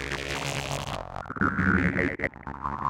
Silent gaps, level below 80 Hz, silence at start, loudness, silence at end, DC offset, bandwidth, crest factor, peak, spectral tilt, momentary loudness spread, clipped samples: none; -44 dBFS; 0 s; -28 LUFS; 0 s; under 0.1%; 17 kHz; 20 dB; -8 dBFS; -5 dB/octave; 12 LU; under 0.1%